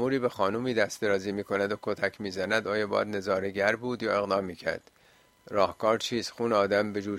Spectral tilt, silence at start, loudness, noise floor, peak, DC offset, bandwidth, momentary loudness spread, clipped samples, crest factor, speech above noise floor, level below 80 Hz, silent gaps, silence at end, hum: -4.5 dB/octave; 0 s; -29 LUFS; -61 dBFS; -8 dBFS; under 0.1%; 15.5 kHz; 5 LU; under 0.1%; 20 dB; 33 dB; -66 dBFS; none; 0 s; none